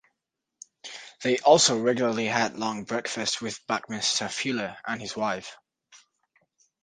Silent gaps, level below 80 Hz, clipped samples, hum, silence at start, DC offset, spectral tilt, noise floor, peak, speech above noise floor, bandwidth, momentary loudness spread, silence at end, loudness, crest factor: none; -70 dBFS; under 0.1%; none; 0.85 s; under 0.1%; -2.5 dB/octave; -84 dBFS; -4 dBFS; 58 dB; 10 kHz; 17 LU; 0.85 s; -26 LUFS; 22 dB